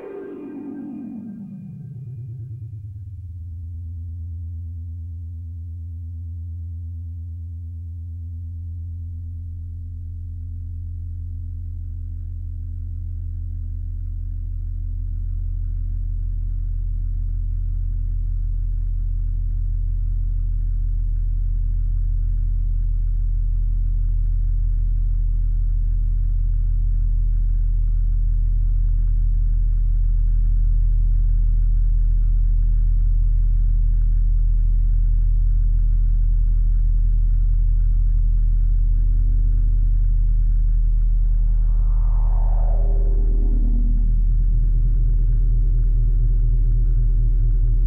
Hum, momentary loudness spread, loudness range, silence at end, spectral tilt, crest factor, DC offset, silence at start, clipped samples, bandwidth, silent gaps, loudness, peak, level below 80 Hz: none; 11 LU; 11 LU; 0 s; -11.5 dB/octave; 8 dB; under 0.1%; 0 s; under 0.1%; 1 kHz; none; -25 LUFS; -10 dBFS; -18 dBFS